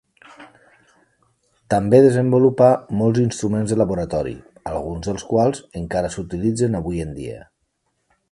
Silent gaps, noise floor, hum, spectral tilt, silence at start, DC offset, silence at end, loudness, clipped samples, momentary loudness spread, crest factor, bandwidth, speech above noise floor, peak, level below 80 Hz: none; -71 dBFS; none; -7 dB/octave; 0.4 s; under 0.1%; 0.9 s; -19 LUFS; under 0.1%; 16 LU; 20 dB; 11.5 kHz; 52 dB; 0 dBFS; -44 dBFS